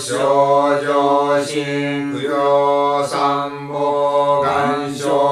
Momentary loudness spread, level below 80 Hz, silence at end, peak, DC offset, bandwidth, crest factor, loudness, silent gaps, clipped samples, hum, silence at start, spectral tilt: 7 LU; -60 dBFS; 0 s; -2 dBFS; under 0.1%; 13 kHz; 14 dB; -17 LUFS; none; under 0.1%; none; 0 s; -5 dB/octave